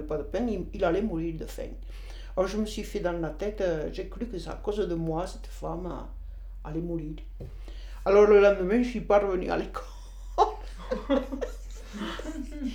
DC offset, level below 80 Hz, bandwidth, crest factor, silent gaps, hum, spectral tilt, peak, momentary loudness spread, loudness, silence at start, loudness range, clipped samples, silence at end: under 0.1%; -40 dBFS; 16 kHz; 20 dB; none; none; -6.5 dB/octave; -8 dBFS; 20 LU; -28 LUFS; 0 s; 10 LU; under 0.1%; 0 s